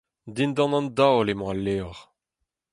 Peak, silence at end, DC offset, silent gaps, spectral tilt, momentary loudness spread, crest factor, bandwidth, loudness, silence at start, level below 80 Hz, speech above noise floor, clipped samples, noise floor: -6 dBFS; 0.7 s; under 0.1%; none; -6.5 dB/octave; 12 LU; 18 dB; 11.5 kHz; -24 LUFS; 0.25 s; -52 dBFS; 59 dB; under 0.1%; -82 dBFS